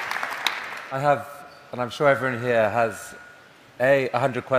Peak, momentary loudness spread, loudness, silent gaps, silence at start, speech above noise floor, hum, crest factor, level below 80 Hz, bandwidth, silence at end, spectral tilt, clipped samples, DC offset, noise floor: -2 dBFS; 18 LU; -23 LUFS; none; 0 s; 27 dB; none; 24 dB; -64 dBFS; 16 kHz; 0 s; -5 dB/octave; under 0.1%; under 0.1%; -50 dBFS